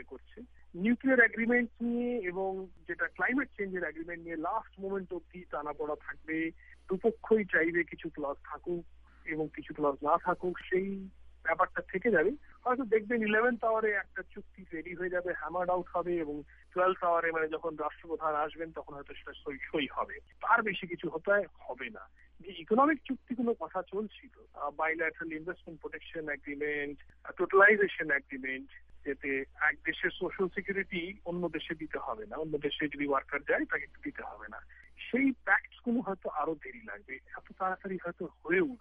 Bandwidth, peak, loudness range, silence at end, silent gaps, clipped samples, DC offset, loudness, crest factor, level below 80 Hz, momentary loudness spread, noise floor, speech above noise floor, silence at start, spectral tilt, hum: 4.8 kHz; -10 dBFS; 6 LU; 0.05 s; none; under 0.1%; under 0.1%; -32 LUFS; 22 dB; -62 dBFS; 16 LU; -52 dBFS; 19 dB; 0 s; -8 dB/octave; none